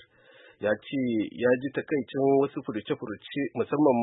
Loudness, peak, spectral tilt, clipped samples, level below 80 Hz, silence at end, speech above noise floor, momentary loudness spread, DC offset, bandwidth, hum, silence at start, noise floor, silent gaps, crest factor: -28 LUFS; -10 dBFS; -10.5 dB/octave; under 0.1%; -72 dBFS; 0 s; 29 dB; 9 LU; under 0.1%; 4 kHz; none; 0.6 s; -56 dBFS; none; 18 dB